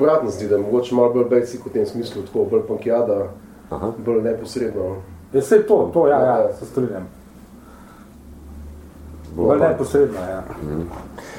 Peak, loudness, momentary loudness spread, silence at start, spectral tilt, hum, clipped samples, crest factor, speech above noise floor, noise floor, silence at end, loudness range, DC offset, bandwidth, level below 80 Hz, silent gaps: -2 dBFS; -19 LUFS; 19 LU; 0 s; -7 dB/octave; none; under 0.1%; 18 dB; 24 dB; -42 dBFS; 0 s; 5 LU; under 0.1%; 15.5 kHz; -44 dBFS; none